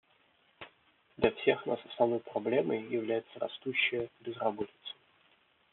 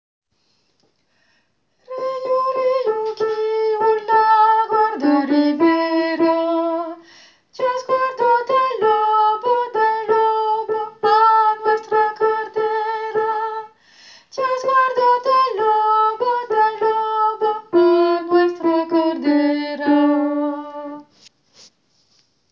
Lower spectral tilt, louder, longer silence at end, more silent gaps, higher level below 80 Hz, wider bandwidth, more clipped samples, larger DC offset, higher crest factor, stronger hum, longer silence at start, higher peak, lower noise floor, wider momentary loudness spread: second, -3 dB/octave vs -5 dB/octave; second, -33 LUFS vs -18 LUFS; second, 0.8 s vs 1.5 s; neither; first, -70 dBFS vs -76 dBFS; second, 4.3 kHz vs 7.2 kHz; neither; neither; first, 22 dB vs 14 dB; neither; second, 0.6 s vs 1.9 s; second, -12 dBFS vs -4 dBFS; first, -69 dBFS vs -65 dBFS; first, 19 LU vs 9 LU